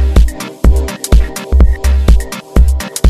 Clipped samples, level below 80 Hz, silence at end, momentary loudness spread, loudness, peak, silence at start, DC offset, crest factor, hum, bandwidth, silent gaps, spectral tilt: 1%; -10 dBFS; 0 s; 4 LU; -13 LUFS; 0 dBFS; 0 s; 0.7%; 10 dB; none; 14 kHz; none; -6 dB/octave